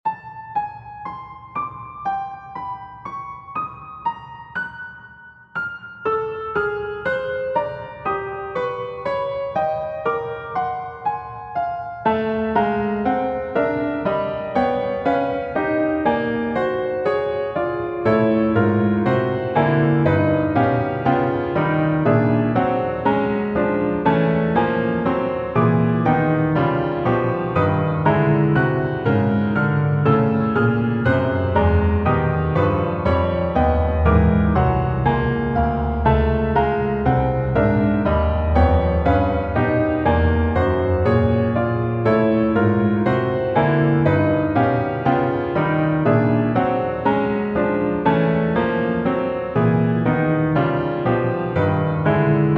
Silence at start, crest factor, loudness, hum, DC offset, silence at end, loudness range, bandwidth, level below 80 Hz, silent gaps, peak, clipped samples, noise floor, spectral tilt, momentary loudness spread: 0.05 s; 16 dB; -20 LUFS; none; under 0.1%; 0 s; 7 LU; 5.6 kHz; -32 dBFS; none; -4 dBFS; under 0.1%; -44 dBFS; -10 dB/octave; 10 LU